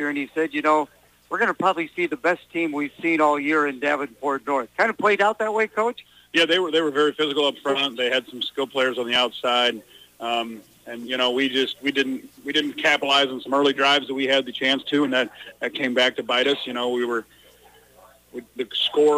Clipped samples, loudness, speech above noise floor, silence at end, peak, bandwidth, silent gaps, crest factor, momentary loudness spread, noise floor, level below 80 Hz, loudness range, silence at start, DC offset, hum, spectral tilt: under 0.1%; -22 LUFS; 30 dB; 0 s; -8 dBFS; 15.5 kHz; none; 16 dB; 10 LU; -53 dBFS; -68 dBFS; 3 LU; 0 s; under 0.1%; none; -3 dB/octave